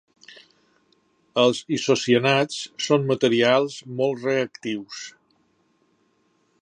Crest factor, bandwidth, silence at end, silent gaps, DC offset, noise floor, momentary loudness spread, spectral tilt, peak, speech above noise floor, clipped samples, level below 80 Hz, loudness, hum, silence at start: 20 dB; 9.8 kHz; 1.5 s; none; under 0.1%; -66 dBFS; 12 LU; -4.5 dB/octave; -4 dBFS; 44 dB; under 0.1%; -72 dBFS; -22 LUFS; none; 0.3 s